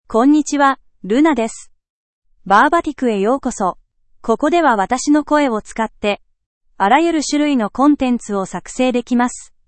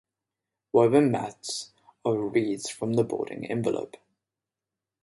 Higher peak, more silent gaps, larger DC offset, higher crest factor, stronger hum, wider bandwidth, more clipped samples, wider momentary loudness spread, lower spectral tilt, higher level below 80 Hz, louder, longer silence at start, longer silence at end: first, 0 dBFS vs -6 dBFS; first, 1.90-2.22 s, 6.46-6.61 s vs none; neither; second, 16 dB vs 22 dB; neither; second, 8.8 kHz vs 11.5 kHz; neither; second, 9 LU vs 13 LU; second, -4.5 dB/octave vs -6 dB/octave; first, -46 dBFS vs -68 dBFS; first, -16 LUFS vs -27 LUFS; second, 0.1 s vs 0.75 s; second, 0.25 s vs 1.15 s